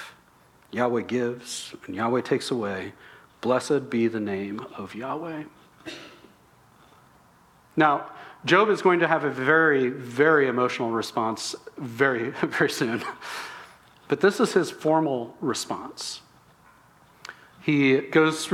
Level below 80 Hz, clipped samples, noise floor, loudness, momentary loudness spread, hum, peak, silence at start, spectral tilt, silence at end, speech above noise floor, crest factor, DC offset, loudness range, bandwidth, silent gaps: -70 dBFS; under 0.1%; -57 dBFS; -24 LUFS; 19 LU; none; -4 dBFS; 0 s; -5 dB/octave; 0 s; 33 dB; 20 dB; under 0.1%; 9 LU; 15 kHz; none